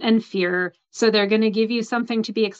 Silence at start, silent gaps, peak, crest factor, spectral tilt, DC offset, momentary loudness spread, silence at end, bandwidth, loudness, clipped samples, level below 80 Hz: 0 s; none; -6 dBFS; 14 dB; -5 dB/octave; under 0.1%; 6 LU; 0.05 s; 8 kHz; -21 LUFS; under 0.1%; -72 dBFS